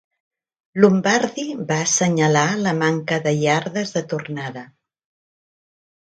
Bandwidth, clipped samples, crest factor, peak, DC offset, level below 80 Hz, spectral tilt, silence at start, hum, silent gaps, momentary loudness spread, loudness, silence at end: 9.4 kHz; under 0.1%; 20 dB; 0 dBFS; under 0.1%; -64 dBFS; -4.5 dB/octave; 0.75 s; none; none; 13 LU; -19 LUFS; 1.55 s